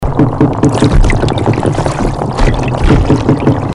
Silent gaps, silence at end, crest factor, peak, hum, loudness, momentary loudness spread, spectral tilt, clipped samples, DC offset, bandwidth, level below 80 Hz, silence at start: none; 0 s; 10 dB; 0 dBFS; none; -11 LUFS; 4 LU; -7 dB/octave; under 0.1%; under 0.1%; 11.5 kHz; -16 dBFS; 0 s